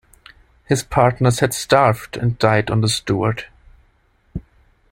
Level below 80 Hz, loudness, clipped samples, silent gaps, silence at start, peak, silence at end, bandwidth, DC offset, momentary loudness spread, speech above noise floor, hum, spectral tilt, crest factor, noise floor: -42 dBFS; -18 LUFS; under 0.1%; none; 0.7 s; -2 dBFS; 0.5 s; 16.5 kHz; under 0.1%; 20 LU; 41 dB; none; -5 dB/octave; 18 dB; -59 dBFS